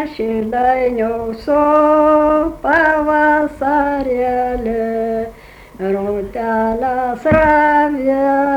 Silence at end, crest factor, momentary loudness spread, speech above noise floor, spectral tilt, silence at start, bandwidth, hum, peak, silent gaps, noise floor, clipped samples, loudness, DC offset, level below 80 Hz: 0 s; 12 dB; 9 LU; 24 dB; -7.5 dB/octave; 0 s; 19 kHz; none; -2 dBFS; none; -38 dBFS; under 0.1%; -15 LUFS; under 0.1%; -38 dBFS